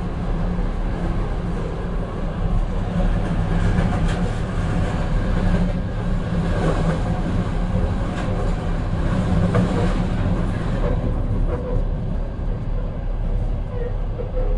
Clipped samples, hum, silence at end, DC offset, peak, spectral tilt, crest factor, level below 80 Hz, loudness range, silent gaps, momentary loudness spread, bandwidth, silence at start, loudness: under 0.1%; none; 0 s; under 0.1%; -6 dBFS; -8 dB/octave; 14 dB; -24 dBFS; 3 LU; none; 6 LU; 10 kHz; 0 s; -24 LUFS